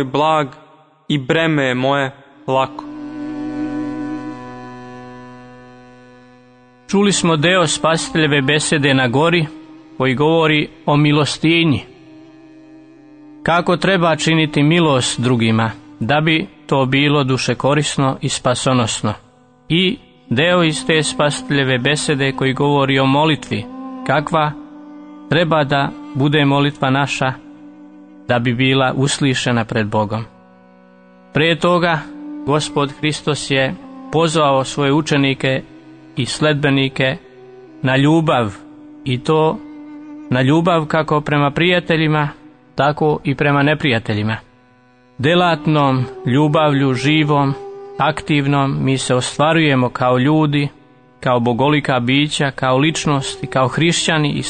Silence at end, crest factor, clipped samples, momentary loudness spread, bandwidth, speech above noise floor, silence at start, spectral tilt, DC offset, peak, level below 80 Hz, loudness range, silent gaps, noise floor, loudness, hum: 0 s; 14 dB; under 0.1%; 12 LU; 9.6 kHz; 35 dB; 0 s; -5 dB/octave; under 0.1%; -2 dBFS; -48 dBFS; 4 LU; none; -50 dBFS; -16 LUFS; none